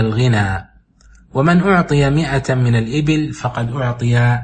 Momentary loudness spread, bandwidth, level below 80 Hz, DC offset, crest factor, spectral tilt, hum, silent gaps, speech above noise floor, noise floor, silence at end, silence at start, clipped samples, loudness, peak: 8 LU; 8.8 kHz; -38 dBFS; under 0.1%; 14 dB; -7 dB/octave; none; none; 32 dB; -47 dBFS; 0 s; 0 s; under 0.1%; -16 LUFS; -2 dBFS